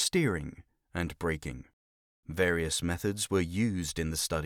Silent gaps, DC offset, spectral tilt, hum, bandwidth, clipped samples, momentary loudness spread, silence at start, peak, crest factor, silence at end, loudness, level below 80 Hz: 1.73-2.23 s; under 0.1%; -4 dB/octave; none; 19.5 kHz; under 0.1%; 13 LU; 0 s; -14 dBFS; 18 dB; 0 s; -31 LUFS; -48 dBFS